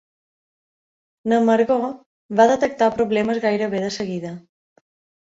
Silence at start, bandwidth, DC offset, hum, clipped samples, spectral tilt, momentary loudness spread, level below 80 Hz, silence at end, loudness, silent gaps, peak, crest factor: 1.25 s; 7.8 kHz; under 0.1%; none; under 0.1%; -5.5 dB/octave; 14 LU; -60 dBFS; 0.8 s; -20 LUFS; 2.06-2.29 s; -2 dBFS; 18 dB